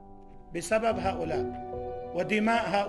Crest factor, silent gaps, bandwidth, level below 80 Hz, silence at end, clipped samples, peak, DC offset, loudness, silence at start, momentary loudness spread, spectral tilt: 18 dB; none; 13 kHz; -52 dBFS; 0 s; under 0.1%; -12 dBFS; under 0.1%; -30 LUFS; 0 s; 12 LU; -5 dB/octave